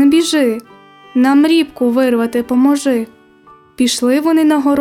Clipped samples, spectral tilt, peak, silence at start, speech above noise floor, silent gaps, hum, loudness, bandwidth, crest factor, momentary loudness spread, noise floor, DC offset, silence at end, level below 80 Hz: under 0.1%; -3.5 dB/octave; -2 dBFS; 0 s; 32 dB; none; none; -13 LUFS; 16 kHz; 12 dB; 7 LU; -44 dBFS; under 0.1%; 0 s; -56 dBFS